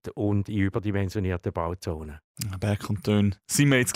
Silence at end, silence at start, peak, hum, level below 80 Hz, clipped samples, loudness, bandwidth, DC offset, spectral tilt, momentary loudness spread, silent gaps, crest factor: 0 s; 0.05 s; -10 dBFS; none; -48 dBFS; under 0.1%; -27 LUFS; 16 kHz; under 0.1%; -5.5 dB/octave; 12 LU; 2.24-2.35 s; 16 dB